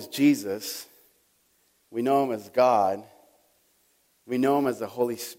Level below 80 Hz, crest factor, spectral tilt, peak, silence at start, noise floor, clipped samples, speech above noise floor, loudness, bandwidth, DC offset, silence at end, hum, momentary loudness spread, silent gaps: -76 dBFS; 18 dB; -5 dB/octave; -10 dBFS; 0 s; -67 dBFS; under 0.1%; 42 dB; -25 LUFS; 16.5 kHz; under 0.1%; 0.05 s; none; 13 LU; none